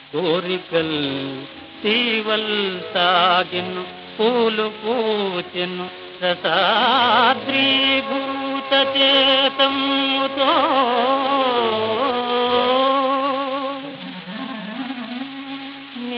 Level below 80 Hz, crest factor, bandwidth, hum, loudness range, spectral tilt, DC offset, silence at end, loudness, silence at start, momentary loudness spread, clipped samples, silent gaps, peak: -64 dBFS; 16 dB; 6.2 kHz; none; 5 LU; -6 dB/octave; under 0.1%; 0 s; -18 LUFS; 0 s; 15 LU; under 0.1%; none; -4 dBFS